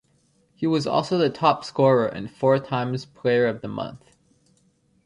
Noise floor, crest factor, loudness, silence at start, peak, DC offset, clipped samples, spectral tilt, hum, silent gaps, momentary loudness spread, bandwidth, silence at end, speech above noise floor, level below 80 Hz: -64 dBFS; 20 dB; -23 LUFS; 0.6 s; -4 dBFS; under 0.1%; under 0.1%; -6.5 dB/octave; none; none; 11 LU; 11 kHz; 1.1 s; 41 dB; -62 dBFS